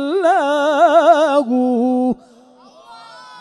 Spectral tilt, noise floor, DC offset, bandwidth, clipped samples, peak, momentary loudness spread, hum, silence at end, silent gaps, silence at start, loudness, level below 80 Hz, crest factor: -4.5 dB/octave; -46 dBFS; under 0.1%; 11.5 kHz; under 0.1%; 0 dBFS; 7 LU; none; 0 s; none; 0 s; -14 LUFS; -62 dBFS; 16 dB